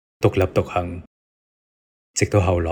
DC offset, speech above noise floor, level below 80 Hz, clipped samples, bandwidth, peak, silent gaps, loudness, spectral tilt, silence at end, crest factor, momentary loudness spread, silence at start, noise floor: under 0.1%; over 70 dB; -46 dBFS; under 0.1%; over 20 kHz; -2 dBFS; 1.07-2.14 s; -21 LUFS; -6 dB/octave; 0 s; 20 dB; 12 LU; 0.2 s; under -90 dBFS